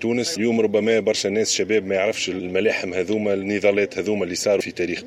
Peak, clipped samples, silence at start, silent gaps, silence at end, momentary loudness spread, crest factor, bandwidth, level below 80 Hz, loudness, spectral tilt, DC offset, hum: -6 dBFS; under 0.1%; 0 s; none; 0 s; 4 LU; 16 dB; 15 kHz; -62 dBFS; -21 LUFS; -3.5 dB/octave; under 0.1%; none